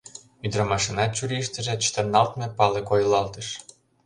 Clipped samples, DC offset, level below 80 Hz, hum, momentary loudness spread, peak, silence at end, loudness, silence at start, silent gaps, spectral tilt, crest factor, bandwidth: under 0.1%; under 0.1%; -52 dBFS; none; 12 LU; -4 dBFS; 0.45 s; -24 LUFS; 0.05 s; none; -4 dB/octave; 20 dB; 11 kHz